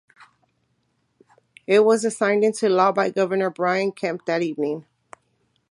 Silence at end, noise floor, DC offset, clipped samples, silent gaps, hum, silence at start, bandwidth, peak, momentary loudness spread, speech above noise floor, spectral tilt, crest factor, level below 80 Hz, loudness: 0.9 s; -70 dBFS; under 0.1%; under 0.1%; none; none; 1.7 s; 11.5 kHz; -4 dBFS; 10 LU; 49 dB; -5 dB/octave; 20 dB; -76 dBFS; -21 LUFS